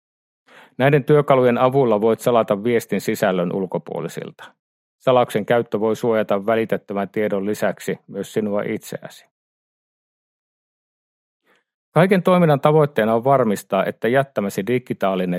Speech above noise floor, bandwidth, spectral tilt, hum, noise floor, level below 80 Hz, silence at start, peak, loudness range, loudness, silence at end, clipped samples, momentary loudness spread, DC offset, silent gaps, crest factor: over 71 dB; 16 kHz; -6.5 dB/octave; none; under -90 dBFS; -66 dBFS; 0.8 s; 0 dBFS; 10 LU; -19 LUFS; 0 s; under 0.1%; 12 LU; under 0.1%; 4.59-4.99 s, 9.31-11.40 s, 11.74-11.92 s; 20 dB